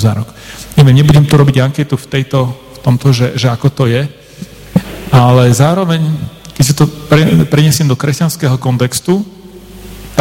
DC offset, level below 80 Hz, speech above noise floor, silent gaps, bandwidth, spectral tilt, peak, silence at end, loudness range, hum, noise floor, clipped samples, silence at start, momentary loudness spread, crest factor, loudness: under 0.1%; -36 dBFS; 23 dB; none; 16.5 kHz; -6 dB/octave; 0 dBFS; 0 s; 3 LU; none; -32 dBFS; 0.5%; 0 s; 15 LU; 10 dB; -11 LUFS